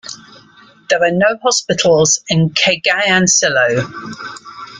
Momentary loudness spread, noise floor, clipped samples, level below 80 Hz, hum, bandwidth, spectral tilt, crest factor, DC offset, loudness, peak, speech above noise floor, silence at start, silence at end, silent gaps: 18 LU; -45 dBFS; under 0.1%; -52 dBFS; none; 10 kHz; -3 dB/octave; 14 dB; under 0.1%; -13 LUFS; -2 dBFS; 31 dB; 0.05 s; 0 s; none